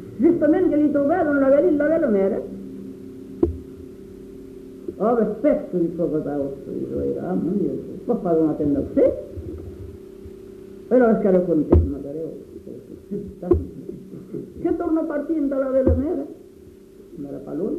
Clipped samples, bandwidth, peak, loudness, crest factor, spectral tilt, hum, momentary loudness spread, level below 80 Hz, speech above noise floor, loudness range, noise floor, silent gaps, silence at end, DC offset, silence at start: under 0.1%; 6.2 kHz; -2 dBFS; -21 LUFS; 20 dB; -10.5 dB/octave; none; 22 LU; -38 dBFS; 25 dB; 5 LU; -45 dBFS; none; 0 s; under 0.1%; 0 s